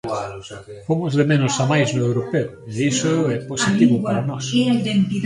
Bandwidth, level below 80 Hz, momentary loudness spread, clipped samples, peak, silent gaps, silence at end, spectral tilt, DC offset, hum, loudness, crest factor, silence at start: 11.5 kHz; -54 dBFS; 11 LU; under 0.1%; -2 dBFS; none; 0 s; -5.5 dB/octave; under 0.1%; none; -19 LUFS; 16 dB; 0.05 s